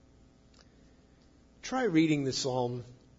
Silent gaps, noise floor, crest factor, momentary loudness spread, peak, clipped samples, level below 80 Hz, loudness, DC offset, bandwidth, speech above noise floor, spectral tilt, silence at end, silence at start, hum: none; -61 dBFS; 18 dB; 14 LU; -14 dBFS; under 0.1%; -64 dBFS; -30 LUFS; under 0.1%; 7.8 kHz; 31 dB; -5 dB/octave; 0.25 s; 1.65 s; none